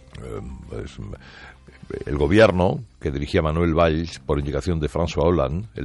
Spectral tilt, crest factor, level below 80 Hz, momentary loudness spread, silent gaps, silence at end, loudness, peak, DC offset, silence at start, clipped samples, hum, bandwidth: -7 dB/octave; 18 dB; -36 dBFS; 19 LU; none; 0 s; -21 LUFS; -4 dBFS; under 0.1%; 0.15 s; under 0.1%; none; 11.5 kHz